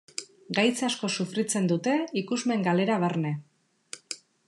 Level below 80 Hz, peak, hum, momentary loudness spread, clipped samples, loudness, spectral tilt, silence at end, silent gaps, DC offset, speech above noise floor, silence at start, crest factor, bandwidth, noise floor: -82 dBFS; -10 dBFS; none; 14 LU; under 0.1%; -27 LUFS; -4.5 dB/octave; 0.3 s; none; under 0.1%; 22 dB; 0.2 s; 18 dB; 12.5 kHz; -48 dBFS